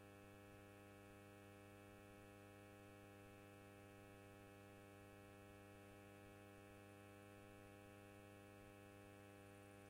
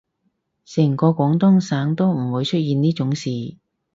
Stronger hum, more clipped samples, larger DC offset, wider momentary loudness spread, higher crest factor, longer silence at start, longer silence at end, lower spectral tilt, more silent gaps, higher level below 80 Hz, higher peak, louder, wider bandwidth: neither; neither; neither; second, 0 LU vs 11 LU; second, 12 dB vs 18 dB; second, 0 s vs 0.7 s; second, 0 s vs 0.45 s; second, -5.5 dB/octave vs -7.5 dB/octave; neither; second, -80 dBFS vs -60 dBFS; second, -52 dBFS vs -2 dBFS; second, -63 LUFS vs -19 LUFS; first, 16 kHz vs 7.8 kHz